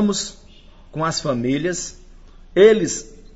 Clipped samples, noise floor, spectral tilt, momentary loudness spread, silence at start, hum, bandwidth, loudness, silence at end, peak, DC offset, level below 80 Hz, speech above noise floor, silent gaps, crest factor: under 0.1%; -45 dBFS; -4.5 dB/octave; 17 LU; 0 s; none; 8 kHz; -19 LUFS; 0.2 s; 0 dBFS; under 0.1%; -44 dBFS; 26 dB; none; 20 dB